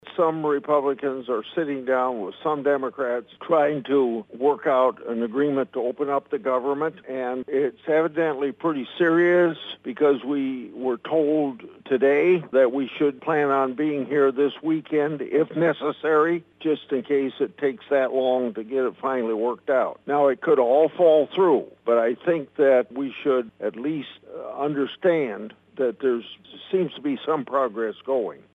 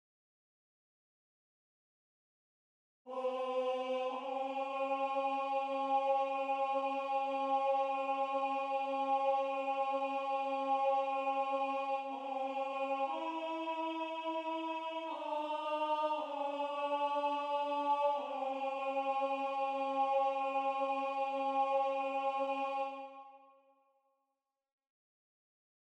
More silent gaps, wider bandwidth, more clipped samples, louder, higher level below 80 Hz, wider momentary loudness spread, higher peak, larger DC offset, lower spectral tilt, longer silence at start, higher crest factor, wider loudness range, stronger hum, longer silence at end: neither; second, 4 kHz vs 9 kHz; neither; first, -23 LUFS vs -36 LUFS; first, -76 dBFS vs under -90 dBFS; first, 9 LU vs 6 LU; first, -6 dBFS vs -22 dBFS; neither; first, -8 dB/octave vs -2.5 dB/octave; second, 0.05 s vs 3.05 s; about the same, 16 dB vs 14 dB; about the same, 5 LU vs 6 LU; neither; second, 0.15 s vs 2.45 s